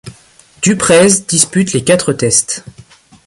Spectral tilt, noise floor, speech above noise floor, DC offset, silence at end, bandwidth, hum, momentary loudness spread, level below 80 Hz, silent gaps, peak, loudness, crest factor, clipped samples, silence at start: -3.5 dB/octave; -45 dBFS; 33 dB; under 0.1%; 0.55 s; 16 kHz; none; 8 LU; -46 dBFS; none; 0 dBFS; -11 LUFS; 14 dB; under 0.1%; 0.05 s